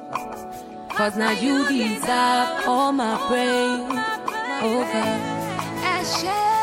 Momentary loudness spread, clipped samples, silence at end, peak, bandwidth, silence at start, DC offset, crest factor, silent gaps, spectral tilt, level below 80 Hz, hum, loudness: 9 LU; under 0.1%; 0 s; -8 dBFS; 16 kHz; 0 s; under 0.1%; 14 dB; none; -3.5 dB/octave; -58 dBFS; none; -22 LUFS